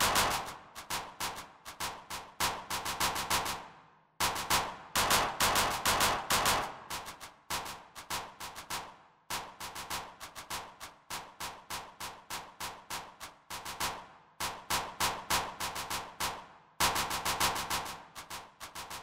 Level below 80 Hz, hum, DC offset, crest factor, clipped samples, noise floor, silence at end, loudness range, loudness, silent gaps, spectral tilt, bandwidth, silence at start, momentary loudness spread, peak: -56 dBFS; none; under 0.1%; 22 dB; under 0.1%; -60 dBFS; 0 s; 12 LU; -34 LUFS; none; -1 dB/octave; 16 kHz; 0 s; 17 LU; -14 dBFS